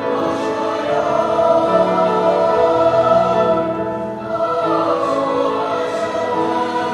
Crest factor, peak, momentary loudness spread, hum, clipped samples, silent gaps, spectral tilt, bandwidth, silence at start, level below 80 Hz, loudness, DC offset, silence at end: 16 dB; -2 dBFS; 6 LU; none; under 0.1%; none; -6 dB/octave; 10.5 kHz; 0 s; -50 dBFS; -17 LUFS; under 0.1%; 0 s